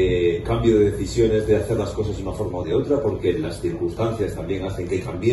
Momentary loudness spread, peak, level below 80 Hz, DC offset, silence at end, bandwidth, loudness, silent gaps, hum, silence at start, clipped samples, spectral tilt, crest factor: 8 LU; -6 dBFS; -36 dBFS; under 0.1%; 0 s; 12.5 kHz; -22 LUFS; none; none; 0 s; under 0.1%; -7 dB/octave; 16 dB